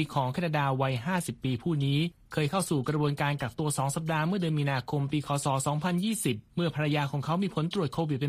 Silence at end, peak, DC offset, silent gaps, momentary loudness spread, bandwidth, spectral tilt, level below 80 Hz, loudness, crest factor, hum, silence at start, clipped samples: 0 s; -14 dBFS; under 0.1%; none; 3 LU; 15 kHz; -5.5 dB/octave; -60 dBFS; -29 LUFS; 16 dB; none; 0 s; under 0.1%